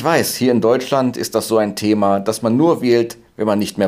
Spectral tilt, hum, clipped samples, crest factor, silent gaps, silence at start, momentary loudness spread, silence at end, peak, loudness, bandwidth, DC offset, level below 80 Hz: -5 dB/octave; none; under 0.1%; 14 dB; none; 0 s; 5 LU; 0 s; -2 dBFS; -17 LUFS; 16 kHz; under 0.1%; -58 dBFS